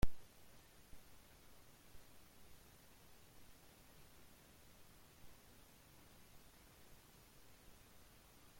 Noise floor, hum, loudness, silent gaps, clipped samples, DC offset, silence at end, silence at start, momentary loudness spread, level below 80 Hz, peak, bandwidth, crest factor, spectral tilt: -65 dBFS; none; -63 LUFS; none; under 0.1%; under 0.1%; 0 s; 0 s; 1 LU; -58 dBFS; -22 dBFS; 16.5 kHz; 26 dB; -5 dB/octave